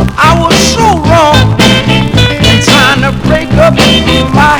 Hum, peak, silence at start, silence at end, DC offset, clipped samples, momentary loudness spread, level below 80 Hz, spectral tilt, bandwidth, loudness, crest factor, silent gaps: none; 0 dBFS; 0 s; 0 s; under 0.1%; 5%; 4 LU; -20 dBFS; -4.5 dB/octave; over 20 kHz; -6 LUFS; 6 dB; none